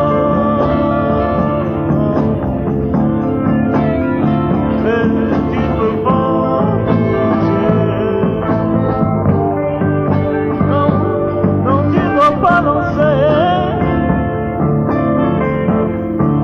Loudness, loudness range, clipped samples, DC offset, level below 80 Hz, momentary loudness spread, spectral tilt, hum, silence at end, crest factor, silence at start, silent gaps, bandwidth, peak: -14 LUFS; 2 LU; under 0.1%; under 0.1%; -32 dBFS; 4 LU; -10 dB/octave; none; 0 s; 14 dB; 0 s; none; 6.4 kHz; 0 dBFS